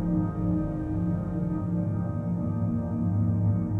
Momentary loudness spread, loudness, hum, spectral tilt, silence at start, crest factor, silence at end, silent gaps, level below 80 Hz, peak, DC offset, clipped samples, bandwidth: 4 LU; -28 LUFS; none; -12 dB/octave; 0 s; 12 dB; 0 s; none; -42 dBFS; -16 dBFS; under 0.1%; under 0.1%; 2.5 kHz